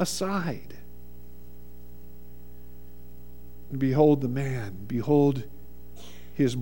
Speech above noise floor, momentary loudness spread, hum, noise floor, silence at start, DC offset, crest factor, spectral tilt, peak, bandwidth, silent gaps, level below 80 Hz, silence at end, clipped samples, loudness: 24 dB; 28 LU; 60 Hz at -50 dBFS; -49 dBFS; 0 s; 1%; 20 dB; -6.5 dB/octave; -8 dBFS; 17.5 kHz; none; -52 dBFS; 0 s; under 0.1%; -26 LUFS